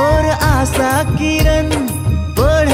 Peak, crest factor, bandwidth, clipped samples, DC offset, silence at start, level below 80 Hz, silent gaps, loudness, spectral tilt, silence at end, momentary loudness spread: -2 dBFS; 12 dB; 16.5 kHz; under 0.1%; under 0.1%; 0 s; -20 dBFS; none; -14 LUFS; -5.5 dB/octave; 0 s; 4 LU